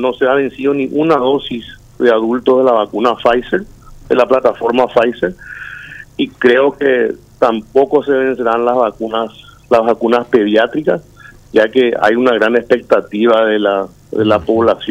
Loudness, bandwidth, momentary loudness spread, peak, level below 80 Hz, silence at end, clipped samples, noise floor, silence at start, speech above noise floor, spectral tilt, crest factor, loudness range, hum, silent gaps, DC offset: -13 LUFS; 9.4 kHz; 9 LU; 0 dBFS; -46 dBFS; 0 s; under 0.1%; -32 dBFS; 0 s; 20 dB; -6.5 dB/octave; 12 dB; 2 LU; 50 Hz at -50 dBFS; none; under 0.1%